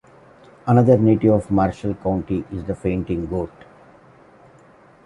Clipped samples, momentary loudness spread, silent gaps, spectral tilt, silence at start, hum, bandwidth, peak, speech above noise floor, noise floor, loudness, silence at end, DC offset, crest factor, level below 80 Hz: under 0.1%; 13 LU; none; -10 dB/octave; 0.65 s; none; 10.5 kHz; -2 dBFS; 31 dB; -50 dBFS; -20 LUFS; 1.6 s; under 0.1%; 18 dB; -42 dBFS